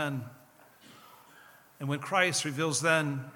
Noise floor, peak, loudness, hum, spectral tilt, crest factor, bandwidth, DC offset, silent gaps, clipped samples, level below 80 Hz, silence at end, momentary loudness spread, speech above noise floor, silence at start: -58 dBFS; -10 dBFS; -29 LUFS; none; -3.5 dB/octave; 22 dB; 19 kHz; under 0.1%; none; under 0.1%; -78 dBFS; 0.05 s; 14 LU; 28 dB; 0 s